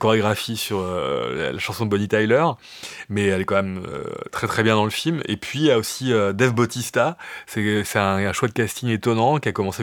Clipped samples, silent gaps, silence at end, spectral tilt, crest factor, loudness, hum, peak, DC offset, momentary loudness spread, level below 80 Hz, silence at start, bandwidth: under 0.1%; none; 0 s; -5 dB/octave; 20 dB; -21 LUFS; none; -2 dBFS; under 0.1%; 10 LU; -56 dBFS; 0 s; 19 kHz